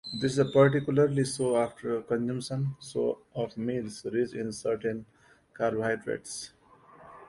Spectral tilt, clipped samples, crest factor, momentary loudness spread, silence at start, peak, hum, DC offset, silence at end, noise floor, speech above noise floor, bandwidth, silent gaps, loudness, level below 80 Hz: -6 dB/octave; under 0.1%; 20 dB; 12 LU; 0.05 s; -8 dBFS; none; under 0.1%; 0.05 s; -55 dBFS; 26 dB; 11.5 kHz; none; -29 LUFS; -64 dBFS